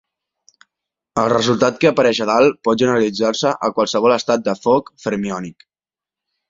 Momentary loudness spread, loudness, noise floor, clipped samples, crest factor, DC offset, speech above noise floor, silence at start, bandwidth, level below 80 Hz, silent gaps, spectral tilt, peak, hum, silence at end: 9 LU; -17 LUFS; under -90 dBFS; under 0.1%; 16 dB; under 0.1%; over 74 dB; 1.15 s; 7.8 kHz; -56 dBFS; none; -5 dB/octave; -2 dBFS; none; 1 s